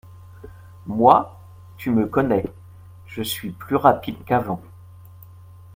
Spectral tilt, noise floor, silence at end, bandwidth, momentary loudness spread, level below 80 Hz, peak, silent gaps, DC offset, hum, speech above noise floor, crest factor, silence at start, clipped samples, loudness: -6 dB/octave; -44 dBFS; 1.15 s; 16.5 kHz; 18 LU; -52 dBFS; 0 dBFS; none; under 0.1%; none; 24 dB; 22 dB; 0.1 s; under 0.1%; -21 LUFS